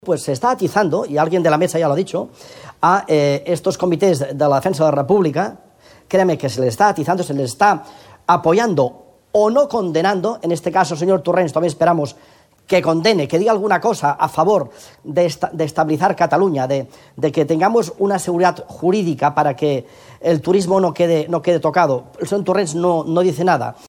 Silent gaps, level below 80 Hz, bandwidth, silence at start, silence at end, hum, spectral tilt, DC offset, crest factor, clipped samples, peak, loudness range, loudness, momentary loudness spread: none; -58 dBFS; 17 kHz; 0.05 s; 0.15 s; none; -6 dB/octave; under 0.1%; 16 dB; under 0.1%; 0 dBFS; 1 LU; -17 LUFS; 6 LU